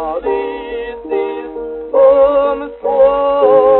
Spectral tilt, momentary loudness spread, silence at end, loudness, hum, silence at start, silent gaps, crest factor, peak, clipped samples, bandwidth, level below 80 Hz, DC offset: -9.5 dB/octave; 14 LU; 0 s; -13 LUFS; none; 0 s; none; 12 dB; 0 dBFS; under 0.1%; 4.1 kHz; -44 dBFS; under 0.1%